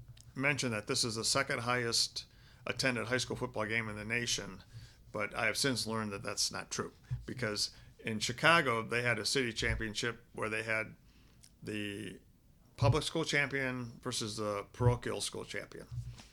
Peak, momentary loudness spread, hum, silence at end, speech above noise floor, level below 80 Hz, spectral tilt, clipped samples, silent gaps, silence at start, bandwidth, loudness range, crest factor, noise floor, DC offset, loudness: -10 dBFS; 13 LU; none; 0.05 s; 29 dB; -54 dBFS; -3.5 dB/octave; under 0.1%; none; 0 s; 16.5 kHz; 4 LU; 26 dB; -64 dBFS; under 0.1%; -34 LUFS